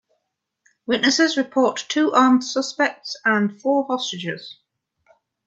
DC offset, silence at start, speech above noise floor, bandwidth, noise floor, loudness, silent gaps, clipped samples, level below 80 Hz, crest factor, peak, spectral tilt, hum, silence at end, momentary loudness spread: under 0.1%; 0.9 s; 57 dB; 8 kHz; -77 dBFS; -20 LUFS; none; under 0.1%; -72 dBFS; 20 dB; -2 dBFS; -3.5 dB/octave; none; 0.95 s; 13 LU